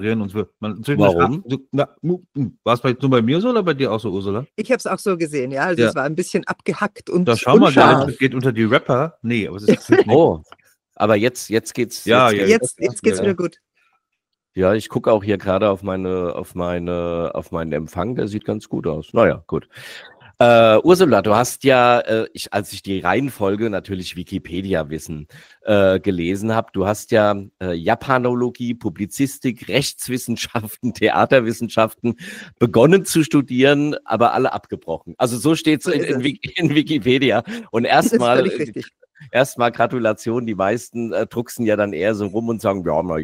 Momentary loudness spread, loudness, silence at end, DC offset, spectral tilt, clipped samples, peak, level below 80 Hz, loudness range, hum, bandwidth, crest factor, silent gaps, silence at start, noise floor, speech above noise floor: 12 LU; -18 LUFS; 0 s; under 0.1%; -5.5 dB/octave; under 0.1%; 0 dBFS; -52 dBFS; 6 LU; none; 16 kHz; 18 dB; none; 0 s; -78 dBFS; 60 dB